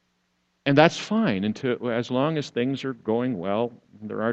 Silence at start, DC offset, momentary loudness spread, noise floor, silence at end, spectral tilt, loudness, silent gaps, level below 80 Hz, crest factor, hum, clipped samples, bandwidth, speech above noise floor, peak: 0.65 s; under 0.1%; 11 LU; -71 dBFS; 0 s; -6 dB/octave; -24 LUFS; none; -64 dBFS; 24 dB; none; under 0.1%; 8.2 kHz; 47 dB; 0 dBFS